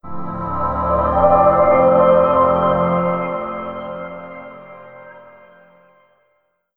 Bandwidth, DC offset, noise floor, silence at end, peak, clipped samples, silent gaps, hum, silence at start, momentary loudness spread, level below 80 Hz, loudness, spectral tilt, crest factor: 4.1 kHz; under 0.1%; -65 dBFS; 1.45 s; -2 dBFS; under 0.1%; none; none; 0.05 s; 20 LU; -38 dBFS; -15 LUFS; -10 dB/octave; 16 dB